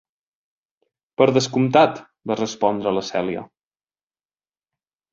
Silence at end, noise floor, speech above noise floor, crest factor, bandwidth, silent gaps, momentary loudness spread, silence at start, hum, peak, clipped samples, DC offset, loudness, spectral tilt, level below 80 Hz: 1.7 s; under -90 dBFS; over 71 dB; 20 dB; 7.8 kHz; none; 14 LU; 1.2 s; none; -2 dBFS; under 0.1%; under 0.1%; -20 LUFS; -5.5 dB/octave; -62 dBFS